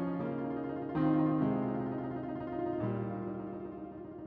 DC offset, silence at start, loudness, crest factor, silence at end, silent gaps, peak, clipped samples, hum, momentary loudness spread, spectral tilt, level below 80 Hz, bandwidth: under 0.1%; 0 s; -35 LUFS; 14 dB; 0 s; none; -20 dBFS; under 0.1%; none; 13 LU; -9 dB/octave; -62 dBFS; 4.6 kHz